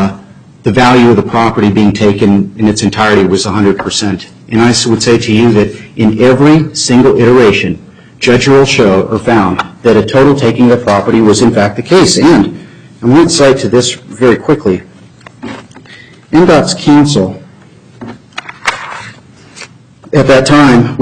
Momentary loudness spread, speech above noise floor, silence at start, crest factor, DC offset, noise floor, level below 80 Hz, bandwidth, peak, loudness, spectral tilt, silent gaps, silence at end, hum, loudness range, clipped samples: 12 LU; 30 dB; 0 s; 8 dB; under 0.1%; -37 dBFS; -38 dBFS; 11 kHz; 0 dBFS; -8 LUFS; -5.5 dB/octave; none; 0 s; none; 4 LU; under 0.1%